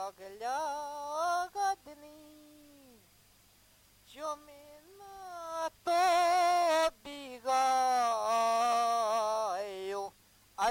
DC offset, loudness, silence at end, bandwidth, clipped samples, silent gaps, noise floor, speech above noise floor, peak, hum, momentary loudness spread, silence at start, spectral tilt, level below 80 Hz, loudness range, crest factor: under 0.1%; -31 LUFS; 0 s; 16.5 kHz; under 0.1%; none; -64 dBFS; 22 dB; -18 dBFS; none; 18 LU; 0 s; -1.5 dB/octave; -70 dBFS; 18 LU; 16 dB